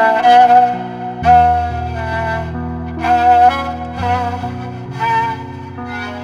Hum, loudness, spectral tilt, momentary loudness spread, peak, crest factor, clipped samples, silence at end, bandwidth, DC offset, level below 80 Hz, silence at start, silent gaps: none; -14 LUFS; -6.5 dB/octave; 16 LU; 0 dBFS; 14 dB; under 0.1%; 0 s; 7.6 kHz; under 0.1%; -34 dBFS; 0 s; none